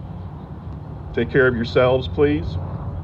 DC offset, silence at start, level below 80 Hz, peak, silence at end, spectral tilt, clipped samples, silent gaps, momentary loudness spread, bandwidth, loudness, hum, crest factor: under 0.1%; 0 s; -36 dBFS; -4 dBFS; 0 s; -8.5 dB/octave; under 0.1%; none; 17 LU; 7.2 kHz; -20 LUFS; none; 16 dB